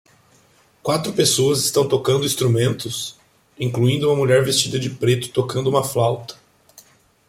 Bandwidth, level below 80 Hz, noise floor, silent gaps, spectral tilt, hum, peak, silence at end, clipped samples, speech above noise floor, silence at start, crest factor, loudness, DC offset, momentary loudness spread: 16.5 kHz; -56 dBFS; -56 dBFS; none; -4.5 dB/octave; none; -4 dBFS; 0.95 s; under 0.1%; 37 dB; 0.85 s; 18 dB; -19 LUFS; under 0.1%; 11 LU